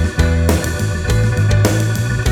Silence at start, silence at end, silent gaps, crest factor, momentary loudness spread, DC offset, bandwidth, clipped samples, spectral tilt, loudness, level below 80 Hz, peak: 0 s; 0 s; none; 14 dB; 4 LU; under 0.1%; 17.5 kHz; under 0.1%; -5.5 dB/octave; -16 LUFS; -22 dBFS; 0 dBFS